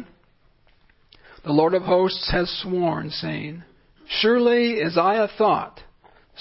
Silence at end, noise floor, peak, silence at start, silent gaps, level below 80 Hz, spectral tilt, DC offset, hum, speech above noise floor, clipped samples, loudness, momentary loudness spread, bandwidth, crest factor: 0.6 s; -59 dBFS; -6 dBFS; 0 s; none; -46 dBFS; -9.5 dB/octave; under 0.1%; none; 38 dB; under 0.1%; -21 LUFS; 13 LU; 5.8 kHz; 18 dB